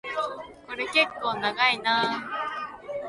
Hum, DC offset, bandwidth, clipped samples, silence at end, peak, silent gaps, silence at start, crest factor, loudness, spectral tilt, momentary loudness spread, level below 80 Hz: none; under 0.1%; 11.5 kHz; under 0.1%; 0 s; -8 dBFS; none; 0.05 s; 20 dB; -26 LUFS; -3 dB/octave; 13 LU; -64 dBFS